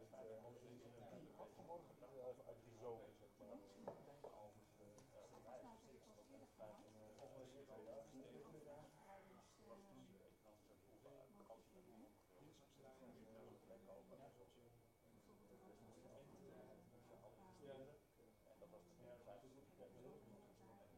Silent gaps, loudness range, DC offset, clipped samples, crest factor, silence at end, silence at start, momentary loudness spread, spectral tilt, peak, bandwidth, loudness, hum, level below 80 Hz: none; 7 LU; under 0.1%; under 0.1%; 24 dB; 0 s; 0 s; 9 LU; -6 dB/octave; -40 dBFS; 15.5 kHz; -64 LUFS; none; -84 dBFS